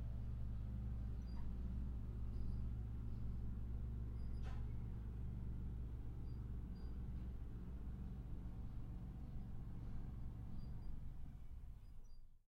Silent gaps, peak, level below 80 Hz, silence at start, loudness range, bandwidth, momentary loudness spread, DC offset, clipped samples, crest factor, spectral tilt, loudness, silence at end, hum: none; -32 dBFS; -48 dBFS; 0 s; 5 LU; 5.2 kHz; 7 LU; under 0.1%; under 0.1%; 14 dB; -9 dB/octave; -51 LUFS; 0.2 s; none